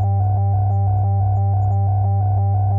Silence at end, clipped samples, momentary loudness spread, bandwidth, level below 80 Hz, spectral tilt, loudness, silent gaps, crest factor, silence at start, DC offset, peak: 0 s; under 0.1%; 0 LU; 1.6 kHz; -38 dBFS; -13.5 dB/octave; -18 LUFS; none; 6 dB; 0 s; under 0.1%; -10 dBFS